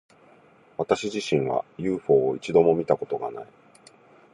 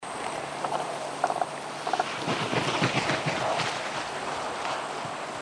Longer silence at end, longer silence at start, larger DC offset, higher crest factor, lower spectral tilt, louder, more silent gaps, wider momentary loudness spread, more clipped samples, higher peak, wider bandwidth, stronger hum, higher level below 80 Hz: first, 0.9 s vs 0 s; first, 0.8 s vs 0 s; neither; about the same, 20 dB vs 20 dB; first, -6 dB/octave vs -3.5 dB/octave; first, -24 LUFS vs -29 LUFS; neither; first, 13 LU vs 8 LU; neither; first, -6 dBFS vs -10 dBFS; second, 10.5 kHz vs 13 kHz; neither; about the same, -62 dBFS vs -64 dBFS